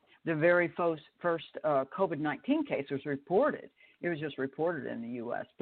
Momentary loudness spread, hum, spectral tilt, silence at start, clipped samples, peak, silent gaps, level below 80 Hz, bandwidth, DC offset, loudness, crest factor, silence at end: 11 LU; none; -5 dB/octave; 0.25 s; under 0.1%; -14 dBFS; none; -76 dBFS; 4.4 kHz; under 0.1%; -32 LUFS; 18 dB; 0.15 s